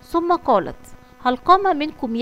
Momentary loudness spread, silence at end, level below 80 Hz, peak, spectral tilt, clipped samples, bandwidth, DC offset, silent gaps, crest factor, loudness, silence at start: 9 LU; 0 s; -46 dBFS; -2 dBFS; -5.5 dB/octave; under 0.1%; 15 kHz; under 0.1%; none; 18 dB; -19 LUFS; 0.1 s